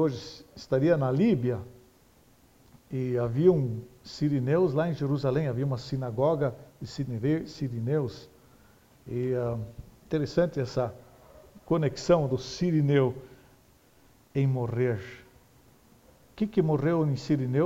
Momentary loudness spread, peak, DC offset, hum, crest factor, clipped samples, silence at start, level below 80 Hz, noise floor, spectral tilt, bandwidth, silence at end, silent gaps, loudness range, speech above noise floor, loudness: 13 LU; -10 dBFS; under 0.1%; none; 18 dB; under 0.1%; 0 s; -56 dBFS; -60 dBFS; -8 dB/octave; 8 kHz; 0 s; none; 5 LU; 33 dB; -28 LUFS